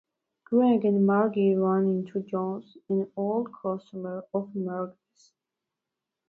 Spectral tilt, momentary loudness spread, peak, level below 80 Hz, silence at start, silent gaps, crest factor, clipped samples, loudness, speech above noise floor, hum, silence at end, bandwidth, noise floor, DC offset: -10 dB/octave; 12 LU; -12 dBFS; -76 dBFS; 0.5 s; none; 16 dB; under 0.1%; -27 LUFS; 61 dB; none; 1.4 s; 4.5 kHz; -87 dBFS; under 0.1%